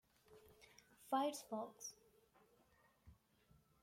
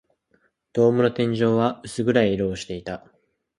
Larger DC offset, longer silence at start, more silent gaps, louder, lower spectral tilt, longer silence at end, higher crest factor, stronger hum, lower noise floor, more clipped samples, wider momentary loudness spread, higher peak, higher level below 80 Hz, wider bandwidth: neither; second, 0.3 s vs 0.75 s; neither; second, -45 LUFS vs -22 LUFS; second, -3.5 dB/octave vs -6.5 dB/octave; about the same, 0.7 s vs 0.6 s; about the same, 22 dB vs 20 dB; neither; first, -75 dBFS vs -66 dBFS; neither; first, 25 LU vs 13 LU; second, -28 dBFS vs -4 dBFS; second, -80 dBFS vs -54 dBFS; first, 16.5 kHz vs 11.5 kHz